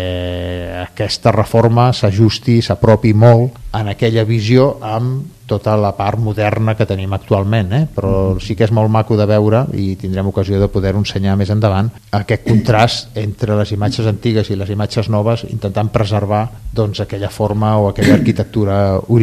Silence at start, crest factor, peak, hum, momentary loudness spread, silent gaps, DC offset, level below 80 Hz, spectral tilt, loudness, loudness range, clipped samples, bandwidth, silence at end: 0 s; 14 dB; 0 dBFS; none; 9 LU; none; under 0.1%; -36 dBFS; -7.5 dB/octave; -15 LUFS; 4 LU; 0.3%; 13.5 kHz; 0 s